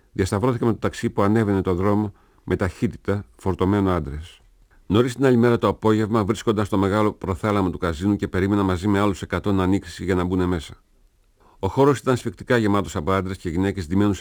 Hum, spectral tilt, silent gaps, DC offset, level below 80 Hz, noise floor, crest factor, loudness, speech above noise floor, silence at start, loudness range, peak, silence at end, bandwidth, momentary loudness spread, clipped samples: none; -7 dB/octave; none; under 0.1%; -44 dBFS; -58 dBFS; 16 dB; -22 LUFS; 37 dB; 0.15 s; 3 LU; -4 dBFS; 0 s; over 20 kHz; 8 LU; under 0.1%